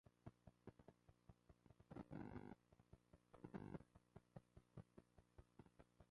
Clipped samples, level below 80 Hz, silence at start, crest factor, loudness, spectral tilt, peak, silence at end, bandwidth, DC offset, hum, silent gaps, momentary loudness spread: under 0.1%; -76 dBFS; 0.05 s; 22 dB; -62 LUFS; -8.5 dB/octave; -42 dBFS; 0.05 s; 10.5 kHz; under 0.1%; none; none; 11 LU